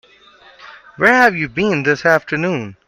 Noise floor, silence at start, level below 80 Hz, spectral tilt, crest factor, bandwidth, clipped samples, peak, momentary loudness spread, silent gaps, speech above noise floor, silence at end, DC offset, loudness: -46 dBFS; 0.6 s; -52 dBFS; -5.5 dB/octave; 16 dB; 16 kHz; under 0.1%; 0 dBFS; 8 LU; none; 31 dB; 0.15 s; under 0.1%; -15 LUFS